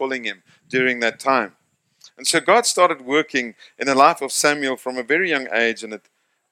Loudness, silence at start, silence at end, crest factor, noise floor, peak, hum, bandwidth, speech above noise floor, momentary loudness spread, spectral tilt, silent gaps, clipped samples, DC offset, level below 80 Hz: -19 LUFS; 0 s; 0.55 s; 20 dB; -54 dBFS; 0 dBFS; none; 16.5 kHz; 34 dB; 15 LU; -2 dB/octave; none; under 0.1%; under 0.1%; -74 dBFS